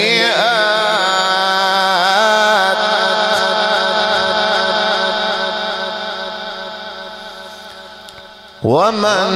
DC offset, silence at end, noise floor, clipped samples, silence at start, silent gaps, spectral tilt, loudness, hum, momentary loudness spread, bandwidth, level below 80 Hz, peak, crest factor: under 0.1%; 0 s; -37 dBFS; under 0.1%; 0 s; none; -2.5 dB/octave; -14 LUFS; none; 18 LU; 15.5 kHz; -56 dBFS; -2 dBFS; 14 dB